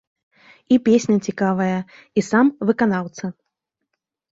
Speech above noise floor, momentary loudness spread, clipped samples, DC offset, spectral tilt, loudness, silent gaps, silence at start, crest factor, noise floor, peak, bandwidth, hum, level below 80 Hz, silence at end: 60 dB; 12 LU; under 0.1%; under 0.1%; -6.5 dB/octave; -19 LUFS; none; 0.7 s; 18 dB; -79 dBFS; -2 dBFS; 8 kHz; none; -62 dBFS; 1.05 s